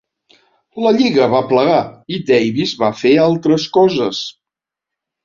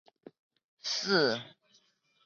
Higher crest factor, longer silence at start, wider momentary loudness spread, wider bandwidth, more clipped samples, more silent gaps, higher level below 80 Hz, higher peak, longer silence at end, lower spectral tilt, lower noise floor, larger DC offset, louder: second, 14 dB vs 22 dB; about the same, 0.75 s vs 0.85 s; second, 12 LU vs 15 LU; about the same, 7.4 kHz vs 7.4 kHz; neither; neither; first, -56 dBFS vs -76 dBFS; first, -2 dBFS vs -12 dBFS; first, 0.95 s vs 0.75 s; first, -6 dB/octave vs -3 dB/octave; first, -85 dBFS vs -70 dBFS; neither; first, -14 LUFS vs -30 LUFS